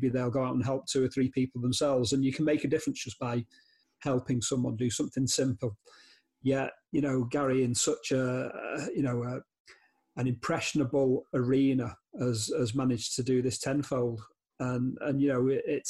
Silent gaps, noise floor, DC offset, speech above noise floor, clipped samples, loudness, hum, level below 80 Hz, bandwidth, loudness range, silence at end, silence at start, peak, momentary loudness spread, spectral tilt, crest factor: 9.60-9.65 s; -61 dBFS; under 0.1%; 31 dB; under 0.1%; -30 LUFS; none; -64 dBFS; 12.5 kHz; 3 LU; 0 s; 0 s; -18 dBFS; 8 LU; -5 dB/octave; 14 dB